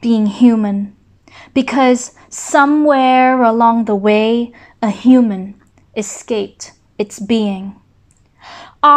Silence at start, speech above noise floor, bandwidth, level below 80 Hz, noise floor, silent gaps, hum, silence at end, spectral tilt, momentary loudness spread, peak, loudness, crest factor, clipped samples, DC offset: 0 s; 39 dB; 10 kHz; -56 dBFS; -52 dBFS; none; none; 0 s; -5 dB/octave; 16 LU; 0 dBFS; -14 LUFS; 14 dB; under 0.1%; under 0.1%